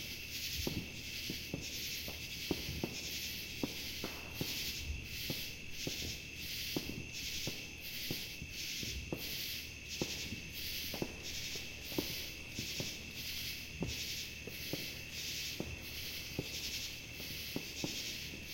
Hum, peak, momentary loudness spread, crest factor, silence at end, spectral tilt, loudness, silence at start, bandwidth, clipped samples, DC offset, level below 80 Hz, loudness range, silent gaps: none; -20 dBFS; 4 LU; 22 dB; 0 s; -2.5 dB/octave; -41 LUFS; 0 s; 16.5 kHz; under 0.1%; under 0.1%; -56 dBFS; 1 LU; none